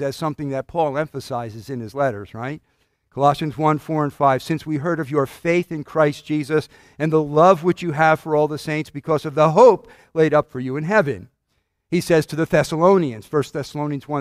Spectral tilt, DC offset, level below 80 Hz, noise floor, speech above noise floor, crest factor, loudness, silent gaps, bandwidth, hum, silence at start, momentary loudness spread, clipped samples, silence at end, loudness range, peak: -6.5 dB/octave; under 0.1%; -54 dBFS; -71 dBFS; 51 dB; 20 dB; -20 LUFS; none; 15.5 kHz; none; 0 s; 13 LU; under 0.1%; 0 s; 6 LU; 0 dBFS